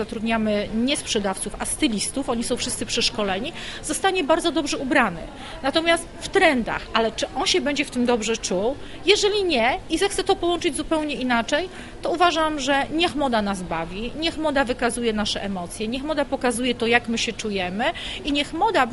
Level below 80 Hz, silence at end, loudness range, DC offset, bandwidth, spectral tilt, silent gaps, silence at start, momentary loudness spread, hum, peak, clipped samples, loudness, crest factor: -42 dBFS; 0 s; 2 LU; under 0.1%; 11.5 kHz; -3 dB/octave; none; 0 s; 8 LU; none; -2 dBFS; under 0.1%; -22 LUFS; 22 dB